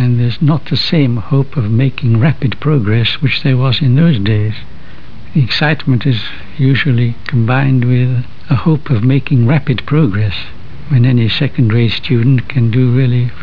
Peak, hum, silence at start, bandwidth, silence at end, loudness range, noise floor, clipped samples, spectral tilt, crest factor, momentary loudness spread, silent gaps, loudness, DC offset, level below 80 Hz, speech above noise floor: 0 dBFS; none; 0 s; 5.4 kHz; 0 s; 1 LU; -34 dBFS; under 0.1%; -9 dB/octave; 12 dB; 5 LU; none; -13 LUFS; 9%; -40 dBFS; 23 dB